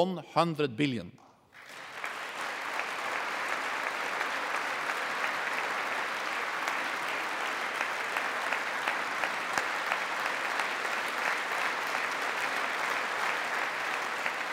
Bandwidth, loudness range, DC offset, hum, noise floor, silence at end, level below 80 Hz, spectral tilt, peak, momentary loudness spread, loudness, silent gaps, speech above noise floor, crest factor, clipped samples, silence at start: 16 kHz; 3 LU; under 0.1%; none; -53 dBFS; 0 s; -82 dBFS; -3 dB/octave; -8 dBFS; 4 LU; -31 LUFS; none; 23 dB; 24 dB; under 0.1%; 0 s